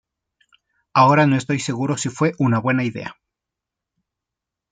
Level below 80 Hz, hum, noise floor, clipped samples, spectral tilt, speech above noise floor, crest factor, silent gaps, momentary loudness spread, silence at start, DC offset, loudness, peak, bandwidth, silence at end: -62 dBFS; none; -85 dBFS; under 0.1%; -6 dB/octave; 67 dB; 20 dB; none; 11 LU; 0.95 s; under 0.1%; -19 LUFS; -2 dBFS; 9.6 kHz; 1.6 s